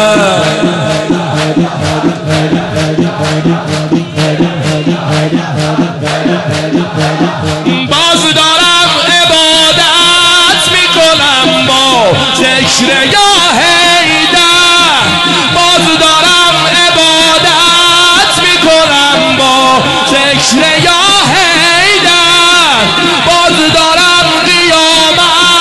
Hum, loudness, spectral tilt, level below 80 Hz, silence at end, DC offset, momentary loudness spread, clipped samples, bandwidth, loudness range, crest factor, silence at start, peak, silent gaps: none; -6 LUFS; -3 dB/octave; -38 dBFS; 0 s; under 0.1%; 8 LU; under 0.1%; 12 kHz; 7 LU; 8 dB; 0 s; 0 dBFS; none